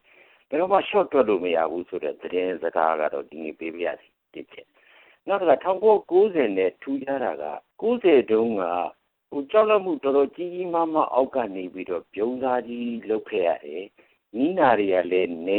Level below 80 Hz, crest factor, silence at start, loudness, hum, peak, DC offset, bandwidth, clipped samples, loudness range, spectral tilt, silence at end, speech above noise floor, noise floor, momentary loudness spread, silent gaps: -68 dBFS; 18 dB; 0.5 s; -24 LUFS; none; -6 dBFS; under 0.1%; 4.2 kHz; under 0.1%; 5 LU; -9 dB/octave; 0 s; 33 dB; -56 dBFS; 14 LU; none